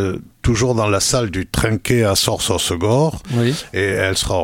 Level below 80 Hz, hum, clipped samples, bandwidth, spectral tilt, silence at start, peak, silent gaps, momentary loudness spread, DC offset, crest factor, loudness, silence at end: -34 dBFS; none; under 0.1%; 17 kHz; -4.5 dB/octave; 0 s; 0 dBFS; none; 5 LU; under 0.1%; 16 dB; -17 LUFS; 0 s